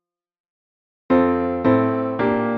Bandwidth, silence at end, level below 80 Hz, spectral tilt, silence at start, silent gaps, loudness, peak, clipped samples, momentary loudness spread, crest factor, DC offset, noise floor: 4.9 kHz; 0 s; -52 dBFS; -10 dB/octave; 1.1 s; none; -19 LUFS; -4 dBFS; under 0.1%; 3 LU; 16 dB; under 0.1%; under -90 dBFS